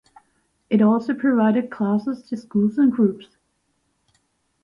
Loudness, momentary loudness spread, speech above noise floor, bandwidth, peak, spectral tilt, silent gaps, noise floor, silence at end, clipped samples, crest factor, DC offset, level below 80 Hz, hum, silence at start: -20 LUFS; 9 LU; 50 dB; 5.6 kHz; -6 dBFS; -9 dB/octave; none; -70 dBFS; 1.45 s; under 0.1%; 16 dB; under 0.1%; -66 dBFS; none; 0.7 s